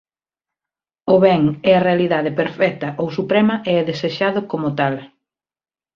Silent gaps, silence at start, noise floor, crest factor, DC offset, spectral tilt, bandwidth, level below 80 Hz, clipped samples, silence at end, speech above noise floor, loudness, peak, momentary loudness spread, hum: none; 1.05 s; under -90 dBFS; 16 dB; under 0.1%; -8 dB/octave; 7 kHz; -58 dBFS; under 0.1%; 0.9 s; over 73 dB; -17 LUFS; -2 dBFS; 8 LU; none